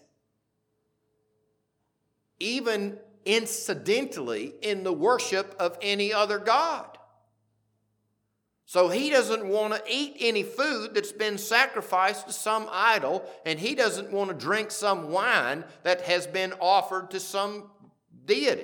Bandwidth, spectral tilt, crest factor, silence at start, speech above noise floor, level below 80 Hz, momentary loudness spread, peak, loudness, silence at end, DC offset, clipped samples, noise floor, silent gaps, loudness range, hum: 19 kHz; -2.5 dB/octave; 22 dB; 2.4 s; 51 dB; -90 dBFS; 8 LU; -6 dBFS; -26 LUFS; 0 s; under 0.1%; under 0.1%; -77 dBFS; none; 4 LU; none